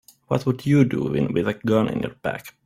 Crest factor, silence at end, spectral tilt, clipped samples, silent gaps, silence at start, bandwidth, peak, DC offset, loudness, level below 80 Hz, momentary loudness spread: 18 dB; 0.15 s; -8 dB/octave; under 0.1%; none; 0.3 s; 15.5 kHz; -4 dBFS; under 0.1%; -22 LUFS; -54 dBFS; 9 LU